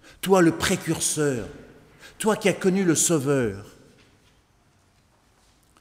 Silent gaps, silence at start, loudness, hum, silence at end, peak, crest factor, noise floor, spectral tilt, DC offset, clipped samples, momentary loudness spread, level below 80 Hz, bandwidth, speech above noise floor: none; 0.25 s; -22 LUFS; none; 2.1 s; -6 dBFS; 18 dB; -61 dBFS; -4 dB/octave; under 0.1%; under 0.1%; 10 LU; -54 dBFS; 16 kHz; 39 dB